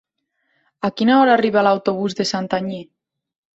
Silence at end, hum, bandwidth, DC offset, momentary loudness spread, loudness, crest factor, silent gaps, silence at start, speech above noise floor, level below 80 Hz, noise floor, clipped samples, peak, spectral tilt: 0.75 s; none; 8 kHz; under 0.1%; 12 LU; -18 LUFS; 18 dB; none; 0.85 s; 54 dB; -62 dBFS; -71 dBFS; under 0.1%; -2 dBFS; -5.5 dB/octave